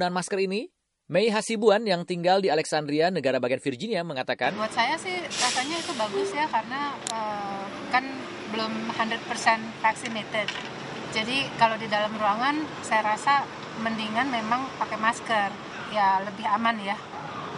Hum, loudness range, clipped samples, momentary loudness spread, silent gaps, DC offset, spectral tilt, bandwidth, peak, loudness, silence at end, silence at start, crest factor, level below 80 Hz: none; 3 LU; under 0.1%; 8 LU; none; under 0.1%; -3.5 dB/octave; 11.5 kHz; -6 dBFS; -26 LUFS; 0 s; 0 s; 20 dB; -68 dBFS